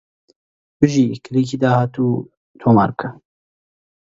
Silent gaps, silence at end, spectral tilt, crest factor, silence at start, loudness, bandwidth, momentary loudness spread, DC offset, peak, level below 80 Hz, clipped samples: 2.37-2.54 s; 1 s; -7.5 dB/octave; 18 dB; 0.8 s; -18 LUFS; 8 kHz; 9 LU; under 0.1%; 0 dBFS; -52 dBFS; under 0.1%